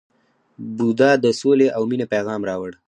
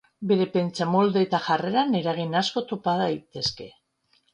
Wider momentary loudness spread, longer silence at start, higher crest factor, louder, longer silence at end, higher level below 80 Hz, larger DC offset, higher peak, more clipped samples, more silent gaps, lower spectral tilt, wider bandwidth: first, 11 LU vs 7 LU; first, 0.6 s vs 0.2 s; about the same, 16 dB vs 18 dB; first, -19 LUFS vs -24 LUFS; second, 0.15 s vs 0.65 s; about the same, -62 dBFS vs -64 dBFS; neither; first, -2 dBFS vs -8 dBFS; neither; neither; about the same, -6 dB/octave vs -6 dB/octave; about the same, 10 kHz vs 10 kHz